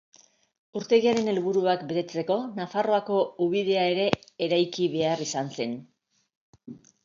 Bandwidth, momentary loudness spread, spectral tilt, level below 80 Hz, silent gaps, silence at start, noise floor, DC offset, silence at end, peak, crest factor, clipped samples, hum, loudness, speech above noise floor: 7.6 kHz; 10 LU; -5 dB/octave; -70 dBFS; 6.35-6.53 s; 0.75 s; -47 dBFS; under 0.1%; 0.25 s; -4 dBFS; 22 dB; under 0.1%; none; -26 LUFS; 22 dB